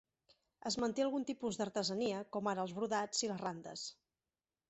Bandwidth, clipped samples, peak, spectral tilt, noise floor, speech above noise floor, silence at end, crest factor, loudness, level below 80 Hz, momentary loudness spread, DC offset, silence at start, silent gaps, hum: 8.2 kHz; under 0.1%; -22 dBFS; -3.5 dB/octave; under -90 dBFS; over 51 dB; 0.75 s; 18 dB; -39 LUFS; -76 dBFS; 10 LU; under 0.1%; 0.65 s; none; none